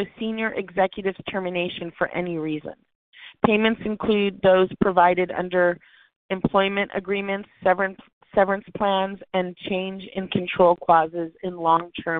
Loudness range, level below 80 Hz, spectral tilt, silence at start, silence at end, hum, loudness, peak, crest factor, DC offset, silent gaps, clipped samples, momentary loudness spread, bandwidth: 4 LU; -54 dBFS; -3.5 dB/octave; 0 s; 0 s; none; -23 LUFS; -2 dBFS; 22 dB; under 0.1%; 2.95-3.12 s, 6.16-6.29 s, 8.13-8.21 s; under 0.1%; 10 LU; 4.4 kHz